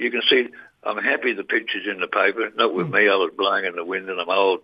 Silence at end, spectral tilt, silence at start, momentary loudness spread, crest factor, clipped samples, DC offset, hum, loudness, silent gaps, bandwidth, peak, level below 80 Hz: 0.05 s; -7 dB/octave; 0 s; 9 LU; 18 dB; under 0.1%; under 0.1%; none; -21 LUFS; none; 5.4 kHz; -4 dBFS; -76 dBFS